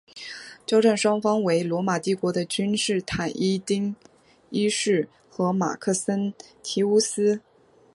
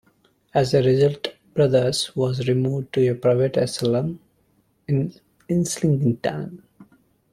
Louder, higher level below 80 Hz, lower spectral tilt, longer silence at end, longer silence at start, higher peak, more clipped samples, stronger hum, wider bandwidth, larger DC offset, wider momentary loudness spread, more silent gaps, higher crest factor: about the same, -24 LUFS vs -22 LUFS; about the same, -60 dBFS vs -56 dBFS; second, -4.5 dB/octave vs -6 dB/octave; about the same, 0.55 s vs 0.5 s; second, 0.15 s vs 0.55 s; about the same, -8 dBFS vs -6 dBFS; neither; neither; second, 11.5 kHz vs 13.5 kHz; neither; about the same, 11 LU vs 12 LU; neither; about the same, 18 dB vs 16 dB